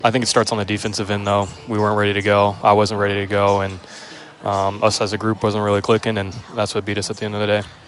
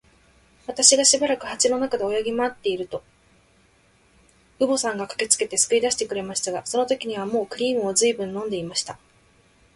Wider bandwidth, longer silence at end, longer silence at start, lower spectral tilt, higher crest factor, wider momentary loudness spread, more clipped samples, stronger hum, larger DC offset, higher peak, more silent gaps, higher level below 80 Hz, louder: about the same, 11.5 kHz vs 11.5 kHz; second, 0.1 s vs 0.8 s; second, 0 s vs 0.7 s; first, -4.5 dB/octave vs -1.5 dB/octave; second, 18 dB vs 24 dB; second, 9 LU vs 12 LU; neither; neither; neither; about the same, 0 dBFS vs 0 dBFS; neither; first, -54 dBFS vs -62 dBFS; first, -19 LUFS vs -22 LUFS